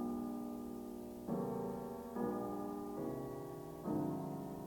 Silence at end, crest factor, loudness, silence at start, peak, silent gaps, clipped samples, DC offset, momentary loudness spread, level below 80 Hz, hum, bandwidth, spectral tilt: 0 s; 14 dB; -43 LUFS; 0 s; -28 dBFS; none; under 0.1%; under 0.1%; 7 LU; -66 dBFS; none; 17.5 kHz; -8 dB/octave